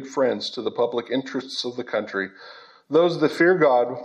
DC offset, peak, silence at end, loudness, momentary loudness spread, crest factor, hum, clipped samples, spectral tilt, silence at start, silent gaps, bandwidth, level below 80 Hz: under 0.1%; -6 dBFS; 0 s; -22 LUFS; 11 LU; 16 dB; none; under 0.1%; -5 dB/octave; 0 s; none; 11 kHz; -80 dBFS